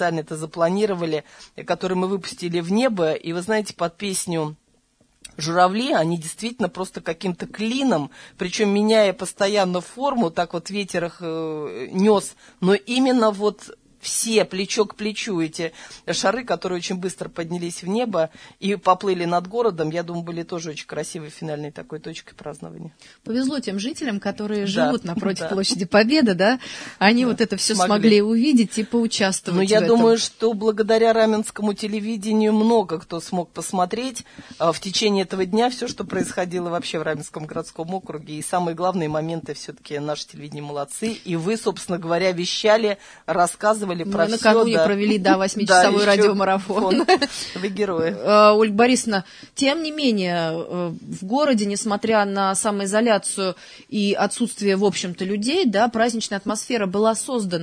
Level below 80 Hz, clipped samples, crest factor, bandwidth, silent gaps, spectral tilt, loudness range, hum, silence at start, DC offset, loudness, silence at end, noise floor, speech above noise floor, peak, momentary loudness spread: -60 dBFS; under 0.1%; 20 dB; 11 kHz; none; -4.5 dB/octave; 8 LU; none; 0 s; under 0.1%; -21 LUFS; 0 s; -62 dBFS; 40 dB; 0 dBFS; 13 LU